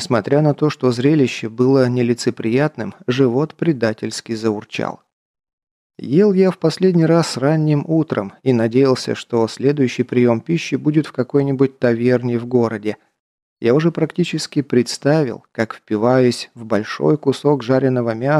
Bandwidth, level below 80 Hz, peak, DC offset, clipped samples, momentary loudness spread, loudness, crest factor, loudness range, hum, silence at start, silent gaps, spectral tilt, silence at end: 12.5 kHz; -62 dBFS; -2 dBFS; under 0.1%; under 0.1%; 7 LU; -17 LUFS; 14 dB; 3 LU; none; 0 s; 5.13-5.34 s, 5.53-5.58 s, 5.71-5.90 s, 13.20-13.57 s; -6.5 dB/octave; 0 s